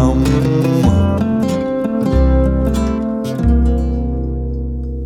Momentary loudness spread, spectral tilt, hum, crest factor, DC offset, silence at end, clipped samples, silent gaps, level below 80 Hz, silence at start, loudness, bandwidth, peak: 8 LU; -8 dB/octave; none; 14 dB; under 0.1%; 0 s; under 0.1%; none; -18 dBFS; 0 s; -16 LUFS; 13.5 kHz; 0 dBFS